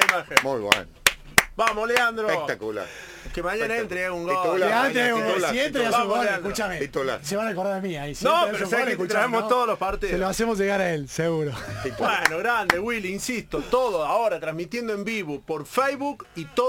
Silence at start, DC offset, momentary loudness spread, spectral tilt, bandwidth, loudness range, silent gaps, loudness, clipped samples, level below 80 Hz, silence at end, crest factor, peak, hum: 0 s; under 0.1%; 9 LU; -3.5 dB/octave; 17 kHz; 2 LU; none; -24 LUFS; under 0.1%; -48 dBFS; 0 s; 24 dB; 0 dBFS; none